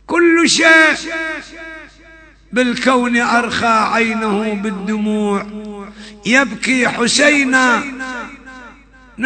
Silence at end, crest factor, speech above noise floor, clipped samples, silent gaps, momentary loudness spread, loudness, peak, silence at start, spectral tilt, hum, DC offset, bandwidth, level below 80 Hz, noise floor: 0 s; 16 dB; 28 dB; under 0.1%; none; 21 LU; -13 LUFS; 0 dBFS; 0.1 s; -3 dB/octave; none; under 0.1%; 9.2 kHz; -48 dBFS; -43 dBFS